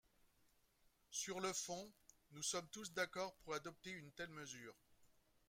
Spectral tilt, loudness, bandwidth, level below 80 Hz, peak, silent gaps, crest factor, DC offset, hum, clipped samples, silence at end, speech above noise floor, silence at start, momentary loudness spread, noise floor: -2 dB/octave; -48 LUFS; 16 kHz; -80 dBFS; -30 dBFS; none; 20 dB; under 0.1%; none; under 0.1%; 0.35 s; 29 dB; 1.1 s; 11 LU; -78 dBFS